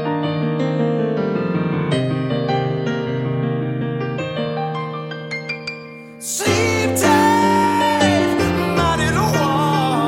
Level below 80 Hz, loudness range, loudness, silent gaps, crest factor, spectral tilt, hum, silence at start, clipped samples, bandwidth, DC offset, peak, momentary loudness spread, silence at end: -42 dBFS; 7 LU; -19 LUFS; none; 16 dB; -5 dB/octave; none; 0 s; under 0.1%; 16.5 kHz; under 0.1%; -2 dBFS; 11 LU; 0 s